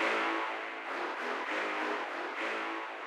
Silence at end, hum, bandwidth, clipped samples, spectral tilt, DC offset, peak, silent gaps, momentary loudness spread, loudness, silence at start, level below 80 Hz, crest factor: 0 s; none; 14.5 kHz; under 0.1%; -1.5 dB/octave; under 0.1%; -20 dBFS; none; 5 LU; -35 LUFS; 0 s; under -90 dBFS; 16 dB